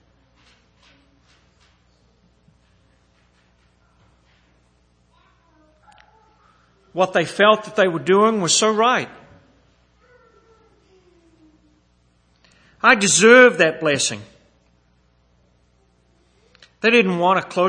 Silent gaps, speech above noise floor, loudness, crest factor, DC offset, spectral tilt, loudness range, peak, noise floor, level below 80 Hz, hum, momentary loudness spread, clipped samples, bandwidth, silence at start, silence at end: none; 44 dB; -15 LUFS; 22 dB; under 0.1%; -3 dB/octave; 10 LU; 0 dBFS; -60 dBFS; -62 dBFS; 60 Hz at -55 dBFS; 12 LU; under 0.1%; 9.8 kHz; 6.95 s; 0 s